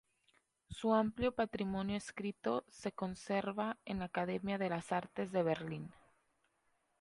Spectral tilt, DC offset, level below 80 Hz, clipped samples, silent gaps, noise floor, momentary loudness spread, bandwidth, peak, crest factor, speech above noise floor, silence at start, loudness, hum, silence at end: -6 dB/octave; under 0.1%; -66 dBFS; under 0.1%; none; -79 dBFS; 9 LU; 11.5 kHz; -18 dBFS; 20 dB; 41 dB; 0.7 s; -39 LUFS; none; 1.1 s